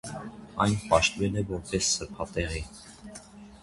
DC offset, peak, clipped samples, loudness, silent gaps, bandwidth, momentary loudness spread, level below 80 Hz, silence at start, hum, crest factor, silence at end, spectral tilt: under 0.1%; -6 dBFS; under 0.1%; -28 LUFS; none; 11.5 kHz; 22 LU; -44 dBFS; 0.05 s; none; 22 dB; 0.05 s; -3.5 dB/octave